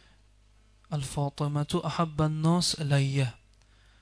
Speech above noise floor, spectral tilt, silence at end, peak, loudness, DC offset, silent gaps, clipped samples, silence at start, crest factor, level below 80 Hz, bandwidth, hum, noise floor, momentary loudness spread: 33 dB; -5.5 dB/octave; 0.65 s; -12 dBFS; -29 LUFS; under 0.1%; none; under 0.1%; 0.9 s; 16 dB; -54 dBFS; 11 kHz; none; -60 dBFS; 8 LU